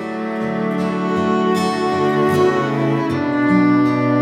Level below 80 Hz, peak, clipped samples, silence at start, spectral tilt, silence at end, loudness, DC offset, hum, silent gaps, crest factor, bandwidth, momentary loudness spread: -58 dBFS; -4 dBFS; under 0.1%; 0 s; -7 dB/octave; 0 s; -17 LUFS; under 0.1%; none; none; 14 dB; 14.5 kHz; 6 LU